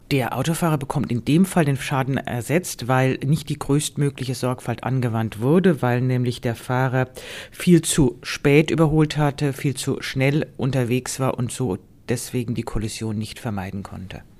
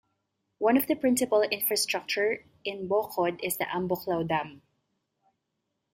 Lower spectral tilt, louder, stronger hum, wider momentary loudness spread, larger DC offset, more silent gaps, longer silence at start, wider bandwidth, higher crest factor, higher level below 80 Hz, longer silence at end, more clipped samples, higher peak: first, -6 dB/octave vs -3.5 dB/octave; first, -22 LUFS vs -28 LUFS; neither; first, 10 LU vs 7 LU; neither; neither; second, 0.1 s vs 0.6 s; about the same, 15.5 kHz vs 16 kHz; about the same, 20 dB vs 18 dB; first, -44 dBFS vs -68 dBFS; second, 0.2 s vs 1.35 s; neither; first, -2 dBFS vs -12 dBFS